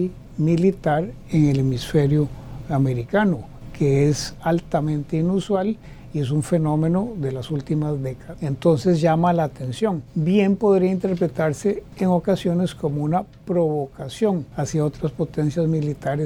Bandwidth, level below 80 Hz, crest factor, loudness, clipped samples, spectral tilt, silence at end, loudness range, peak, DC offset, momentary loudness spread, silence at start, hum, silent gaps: 13 kHz; -44 dBFS; 16 dB; -22 LUFS; under 0.1%; -7.5 dB/octave; 0 s; 3 LU; -6 dBFS; under 0.1%; 9 LU; 0 s; none; none